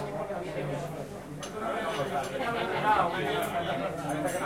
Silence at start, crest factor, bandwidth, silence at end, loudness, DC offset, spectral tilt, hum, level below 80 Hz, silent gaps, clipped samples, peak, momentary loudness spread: 0 s; 20 dB; 16.5 kHz; 0 s; -31 LUFS; under 0.1%; -5 dB/octave; none; -58 dBFS; none; under 0.1%; -12 dBFS; 12 LU